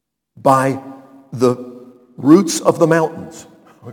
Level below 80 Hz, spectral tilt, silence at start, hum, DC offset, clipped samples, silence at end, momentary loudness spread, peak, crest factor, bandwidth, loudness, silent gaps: -60 dBFS; -5.5 dB/octave; 0.45 s; none; under 0.1%; under 0.1%; 0 s; 21 LU; 0 dBFS; 16 dB; 18 kHz; -15 LUFS; none